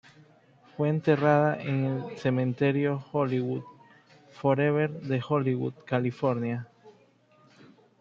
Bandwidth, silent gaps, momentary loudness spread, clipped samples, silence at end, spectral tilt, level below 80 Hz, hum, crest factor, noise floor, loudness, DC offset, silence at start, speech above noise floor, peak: 7 kHz; none; 9 LU; under 0.1%; 1.1 s; -9 dB/octave; -70 dBFS; none; 20 dB; -61 dBFS; -28 LUFS; under 0.1%; 0.8 s; 35 dB; -8 dBFS